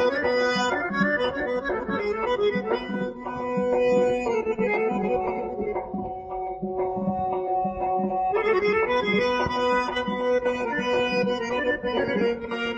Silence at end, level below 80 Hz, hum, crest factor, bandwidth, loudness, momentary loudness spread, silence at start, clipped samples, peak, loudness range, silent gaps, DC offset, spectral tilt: 0 s; -50 dBFS; none; 14 dB; 8 kHz; -25 LUFS; 7 LU; 0 s; under 0.1%; -10 dBFS; 4 LU; none; under 0.1%; -5.5 dB/octave